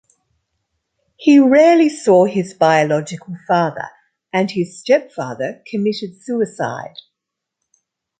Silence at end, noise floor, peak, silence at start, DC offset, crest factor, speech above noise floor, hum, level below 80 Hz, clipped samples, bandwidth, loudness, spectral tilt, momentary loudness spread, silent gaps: 1.3 s; -81 dBFS; -2 dBFS; 1.2 s; under 0.1%; 16 dB; 65 dB; none; -66 dBFS; under 0.1%; 9.2 kHz; -16 LUFS; -6 dB/octave; 17 LU; none